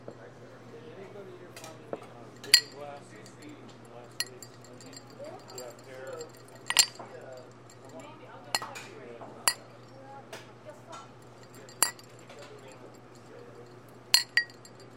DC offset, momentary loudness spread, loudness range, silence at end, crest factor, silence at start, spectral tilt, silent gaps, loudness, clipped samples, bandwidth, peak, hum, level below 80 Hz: under 0.1%; 26 LU; 7 LU; 0 s; 36 dB; 0 s; 0 dB/octave; none; -28 LUFS; under 0.1%; 16.5 kHz; 0 dBFS; none; -76 dBFS